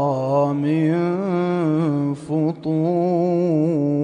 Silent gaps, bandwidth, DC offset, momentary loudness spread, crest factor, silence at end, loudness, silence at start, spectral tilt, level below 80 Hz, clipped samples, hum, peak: none; 10 kHz; under 0.1%; 3 LU; 12 dB; 0 s; -20 LUFS; 0 s; -9.5 dB/octave; -62 dBFS; under 0.1%; none; -8 dBFS